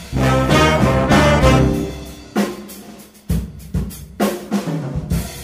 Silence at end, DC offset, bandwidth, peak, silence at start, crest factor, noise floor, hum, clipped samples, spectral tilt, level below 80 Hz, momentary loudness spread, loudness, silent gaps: 0 s; under 0.1%; 16 kHz; -2 dBFS; 0 s; 14 dB; -39 dBFS; none; under 0.1%; -6 dB/octave; -26 dBFS; 15 LU; -17 LUFS; none